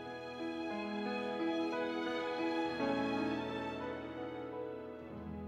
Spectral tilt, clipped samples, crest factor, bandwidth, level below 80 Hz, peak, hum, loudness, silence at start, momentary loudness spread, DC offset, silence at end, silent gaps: -6 dB/octave; under 0.1%; 16 dB; 9.8 kHz; -66 dBFS; -22 dBFS; none; -39 LUFS; 0 s; 9 LU; under 0.1%; 0 s; none